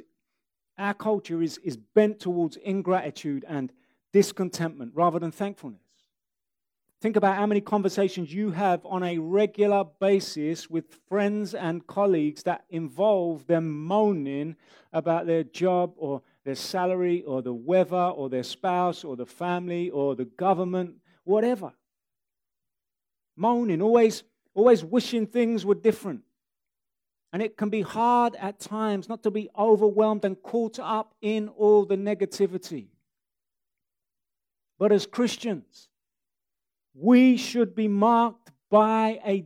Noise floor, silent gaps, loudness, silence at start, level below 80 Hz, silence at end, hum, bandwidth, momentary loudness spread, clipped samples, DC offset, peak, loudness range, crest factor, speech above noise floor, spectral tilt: under -90 dBFS; none; -25 LUFS; 0.8 s; -78 dBFS; 0 s; none; 15.5 kHz; 13 LU; under 0.1%; under 0.1%; -6 dBFS; 5 LU; 20 dB; over 65 dB; -6.5 dB/octave